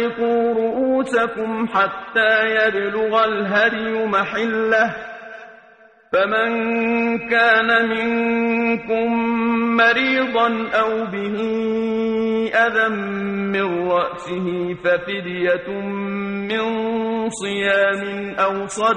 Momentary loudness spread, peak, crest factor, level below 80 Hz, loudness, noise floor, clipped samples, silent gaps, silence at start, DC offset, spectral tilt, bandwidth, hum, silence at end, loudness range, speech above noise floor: 8 LU; -4 dBFS; 16 dB; -56 dBFS; -19 LUFS; -49 dBFS; under 0.1%; none; 0 s; under 0.1%; -5 dB/octave; 9.4 kHz; none; 0 s; 4 LU; 30 dB